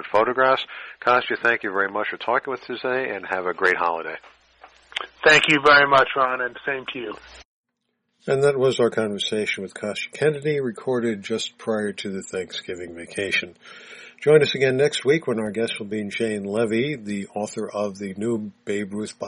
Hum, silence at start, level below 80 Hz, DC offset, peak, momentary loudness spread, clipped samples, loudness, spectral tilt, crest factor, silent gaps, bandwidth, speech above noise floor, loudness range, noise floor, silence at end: none; 0 s; -62 dBFS; under 0.1%; -2 dBFS; 14 LU; under 0.1%; -22 LUFS; -4.5 dB/octave; 20 dB; 7.45-7.64 s; 10.5 kHz; 53 dB; 7 LU; -76 dBFS; 0 s